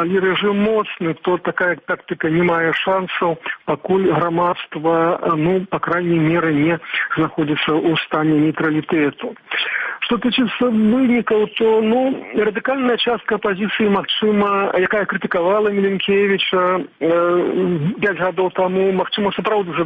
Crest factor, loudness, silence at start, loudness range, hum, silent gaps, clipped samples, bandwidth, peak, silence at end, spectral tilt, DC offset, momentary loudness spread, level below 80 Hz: 12 dB; -18 LUFS; 0 s; 2 LU; none; none; under 0.1%; 8 kHz; -4 dBFS; 0 s; -8.5 dB/octave; under 0.1%; 4 LU; -54 dBFS